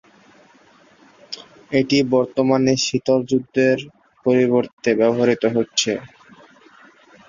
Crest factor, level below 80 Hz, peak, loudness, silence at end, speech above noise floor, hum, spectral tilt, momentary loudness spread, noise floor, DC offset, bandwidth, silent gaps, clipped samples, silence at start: 18 dB; -60 dBFS; -4 dBFS; -19 LUFS; 1.25 s; 34 dB; none; -4.5 dB/octave; 12 LU; -52 dBFS; under 0.1%; 7.6 kHz; 4.73-4.77 s; under 0.1%; 1.3 s